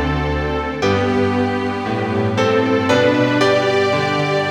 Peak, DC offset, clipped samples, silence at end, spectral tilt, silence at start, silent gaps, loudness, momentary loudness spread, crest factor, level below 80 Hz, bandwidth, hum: -2 dBFS; under 0.1%; under 0.1%; 0 s; -6 dB/octave; 0 s; none; -17 LUFS; 6 LU; 16 dB; -34 dBFS; 13 kHz; none